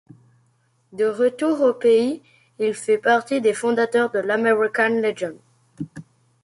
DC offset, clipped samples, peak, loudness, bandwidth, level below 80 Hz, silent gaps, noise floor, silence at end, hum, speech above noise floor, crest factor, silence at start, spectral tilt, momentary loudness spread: under 0.1%; under 0.1%; -4 dBFS; -20 LUFS; 11.5 kHz; -68 dBFS; none; -63 dBFS; 0.4 s; none; 44 dB; 16 dB; 0.95 s; -4.5 dB/octave; 16 LU